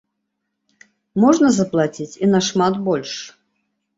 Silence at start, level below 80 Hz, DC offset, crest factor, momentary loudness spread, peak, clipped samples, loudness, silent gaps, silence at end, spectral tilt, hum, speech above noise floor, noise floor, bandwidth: 1.15 s; -60 dBFS; under 0.1%; 18 dB; 15 LU; -2 dBFS; under 0.1%; -18 LUFS; none; 0.7 s; -5.5 dB/octave; none; 59 dB; -76 dBFS; 8 kHz